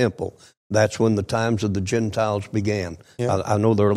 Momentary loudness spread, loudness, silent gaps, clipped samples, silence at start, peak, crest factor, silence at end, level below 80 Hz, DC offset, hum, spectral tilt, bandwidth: 8 LU; -22 LUFS; 0.57-0.70 s; under 0.1%; 0 s; -6 dBFS; 16 dB; 0 s; -52 dBFS; under 0.1%; none; -6.5 dB/octave; 12.5 kHz